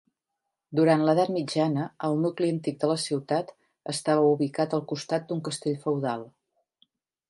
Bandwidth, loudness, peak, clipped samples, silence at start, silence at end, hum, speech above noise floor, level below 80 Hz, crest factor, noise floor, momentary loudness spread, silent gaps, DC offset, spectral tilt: 11.5 kHz; -27 LUFS; -8 dBFS; under 0.1%; 0.7 s; 1 s; none; 58 dB; -76 dBFS; 20 dB; -84 dBFS; 9 LU; none; under 0.1%; -6 dB/octave